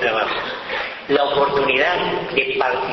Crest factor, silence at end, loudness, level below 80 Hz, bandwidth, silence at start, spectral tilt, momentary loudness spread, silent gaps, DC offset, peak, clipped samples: 16 dB; 0 s; -19 LUFS; -52 dBFS; 6.2 kHz; 0 s; -5 dB/octave; 8 LU; none; under 0.1%; -4 dBFS; under 0.1%